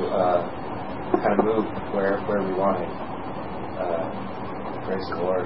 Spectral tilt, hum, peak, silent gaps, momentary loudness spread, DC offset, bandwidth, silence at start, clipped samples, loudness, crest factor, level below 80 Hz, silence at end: -11 dB/octave; none; -4 dBFS; none; 11 LU; 1%; 5.8 kHz; 0 s; under 0.1%; -26 LUFS; 22 dB; -50 dBFS; 0 s